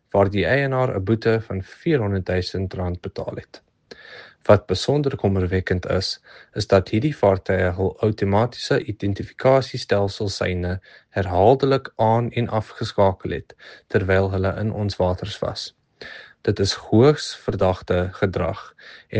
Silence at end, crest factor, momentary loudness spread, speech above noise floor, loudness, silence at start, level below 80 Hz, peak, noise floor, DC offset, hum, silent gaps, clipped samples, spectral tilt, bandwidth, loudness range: 0 s; 20 dB; 13 LU; 24 dB; -21 LUFS; 0.15 s; -50 dBFS; 0 dBFS; -45 dBFS; under 0.1%; none; none; under 0.1%; -6.5 dB/octave; 9.2 kHz; 3 LU